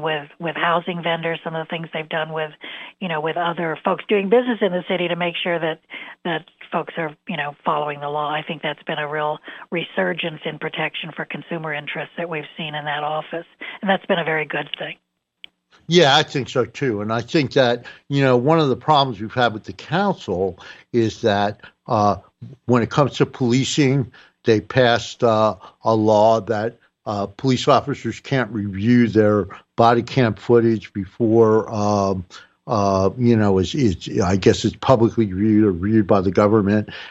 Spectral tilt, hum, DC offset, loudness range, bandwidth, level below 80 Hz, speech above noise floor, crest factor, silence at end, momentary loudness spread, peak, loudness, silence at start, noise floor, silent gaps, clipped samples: -6 dB/octave; none; under 0.1%; 7 LU; 8.2 kHz; -58 dBFS; 28 dB; 18 dB; 0 s; 12 LU; -2 dBFS; -20 LUFS; 0 s; -48 dBFS; none; under 0.1%